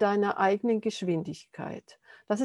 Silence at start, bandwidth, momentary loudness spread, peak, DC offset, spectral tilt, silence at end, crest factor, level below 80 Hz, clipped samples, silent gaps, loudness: 0 s; 11.5 kHz; 14 LU; -10 dBFS; under 0.1%; -6 dB/octave; 0 s; 18 dB; -76 dBFS; under 0.1%; none; -29 LUFS